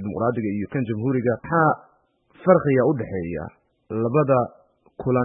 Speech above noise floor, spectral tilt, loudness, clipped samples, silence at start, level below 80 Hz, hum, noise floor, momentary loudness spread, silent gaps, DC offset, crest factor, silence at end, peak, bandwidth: 38 dB; -13.5 dB/octave; -22 LUFS; under 0.1%; 0 s; -54 dBFS; none; -59 dBFS; 12 LU; none; under 0.1%; 20 dB; 0 s; -2 dBFS; 3.8 kHz